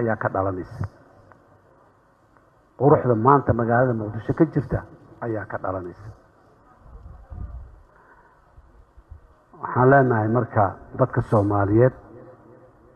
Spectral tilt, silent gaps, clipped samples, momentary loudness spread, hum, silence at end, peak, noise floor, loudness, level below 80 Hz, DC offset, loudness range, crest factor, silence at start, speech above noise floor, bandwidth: -11 dB/octave; none; under 0.1%; 20 LU; none; 0.65 s; -2 dBFS; -58 dBFS; -21 LUFS; -46 dBFS; under 0.1%; 14 LU; 22 dB; 0 s; 37 dB; 5.4 kHz